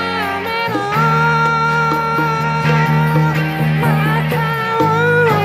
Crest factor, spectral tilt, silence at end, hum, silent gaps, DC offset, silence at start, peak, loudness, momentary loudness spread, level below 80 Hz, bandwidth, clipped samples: 12 dB; -6.5 dB/octave; 0 s; none; none; under 0.1%; 0 s; -2 dBFS; -15 LUFS; 5 LU; -42 dBFS; 15.5 kHz; under 0.1%